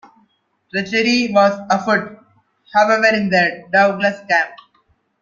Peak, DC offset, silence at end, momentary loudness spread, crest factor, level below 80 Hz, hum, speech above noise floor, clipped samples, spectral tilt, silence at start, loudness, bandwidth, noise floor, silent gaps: -2 dBFS; under 0.1%; 0.65 s; 8 LU; 16 dB; -62 dBFS; none; 46 dB; under 0.1%; -4.5 dB/octave; 0.75 s; -16 LUFS; 7.4 kHz; -62 dBFS; none